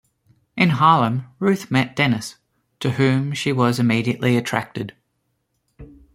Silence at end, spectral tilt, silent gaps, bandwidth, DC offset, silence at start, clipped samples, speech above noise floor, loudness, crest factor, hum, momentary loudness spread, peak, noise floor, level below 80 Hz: 0.3 s; -6 dB/octave; none; 15.5 kHz; under 0.1%; 0.55 s; under 0.1%; 52 dB; -19 LUFS; 20 dB; none; 14 LU; -2 dBFS; -71 dBFS; -56 dBFS